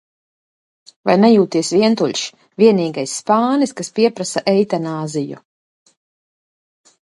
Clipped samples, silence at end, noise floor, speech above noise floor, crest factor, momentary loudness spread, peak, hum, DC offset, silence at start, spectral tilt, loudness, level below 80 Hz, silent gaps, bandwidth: under 0.1%; 1.7 s; under -90 dBFS; over 74 dB; 18 dB; 12 LU; 0 dBFS; none; under 0.1%; 1.05 s; -5 dB/octave; -16 LUFS; -66 dBFS; none; 11.5 kHz